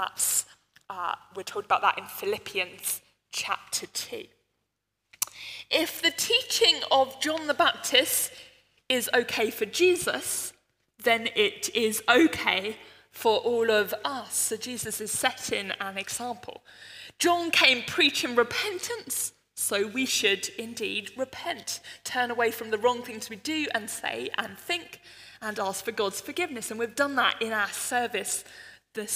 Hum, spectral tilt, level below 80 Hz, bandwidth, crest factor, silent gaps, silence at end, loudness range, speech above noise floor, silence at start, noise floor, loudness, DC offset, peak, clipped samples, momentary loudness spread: none; -1 dB/octave; -72 dBFS; 16 kHz; 26 dB; none; 0 s; 7 LU; 53 dB; 0 s; -80 dBFS; -27 LUFS; under 0.1%; -2 dBFS; under 0.1%; 14 LU